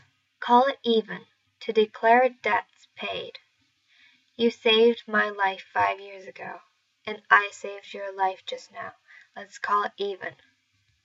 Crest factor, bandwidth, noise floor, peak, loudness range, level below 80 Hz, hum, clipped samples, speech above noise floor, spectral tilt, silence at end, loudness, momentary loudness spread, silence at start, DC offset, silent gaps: 24 dB; 7.8 kHz; -70 dBFS; -2 dBFS; 4 LU; -80 dBFS; none; under 0.1%; 45 dB; -4 dB/octave; 0.75 s; -24 LUFS; 20 LU; 0.4 s; under 0.1%; none